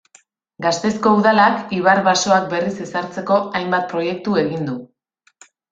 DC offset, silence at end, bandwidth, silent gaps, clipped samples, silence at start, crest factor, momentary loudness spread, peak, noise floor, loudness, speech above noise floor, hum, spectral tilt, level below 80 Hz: under 0.1%; 0.85 s; 7.8 kHz; none; under 0.1%; 0.6 s; 18 dB; 11 LU; -2 dBFS; -62 dBFS; -18 LUFS; 45 dB; none; -4.5 dB/octave; -60 dBFS